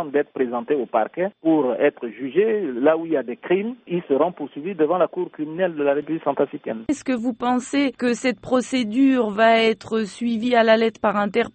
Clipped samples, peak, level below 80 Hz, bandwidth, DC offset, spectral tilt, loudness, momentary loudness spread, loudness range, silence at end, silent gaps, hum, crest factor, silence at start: under 0.1%; -4 dBFS; -62 dBFS; 8.8 kHz; under 0.1%; -5.5 dB/octave; -21 LUFS; 8 LU; 4 LU; 0.05 s; none; none; 18 dB; 0 s